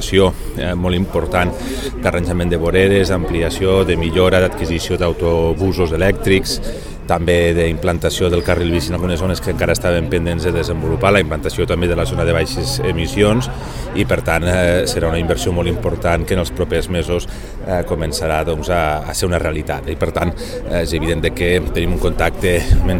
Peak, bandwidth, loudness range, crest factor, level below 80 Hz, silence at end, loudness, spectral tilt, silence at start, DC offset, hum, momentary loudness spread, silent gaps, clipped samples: 0 dBFS; 17 kHz; 3 LU; 16 dB; -26 dBFS; 0 s; -17 LUFS; -5.5 dB/octave; 0 s; 0.4%; none; 7 LU; none; under 0.1%